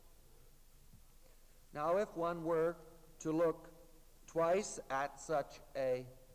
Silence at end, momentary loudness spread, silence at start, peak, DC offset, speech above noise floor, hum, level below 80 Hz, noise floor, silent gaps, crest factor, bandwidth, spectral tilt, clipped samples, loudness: 0 s; 11 LU; 0.1 s; -24 dBFS; under 0.1%; 24 dB; none; -64 dBFS; -61 dBFS; none; 16 dB; 16 kHz; -5 dB/octave; under 0.1%; -38 LUFS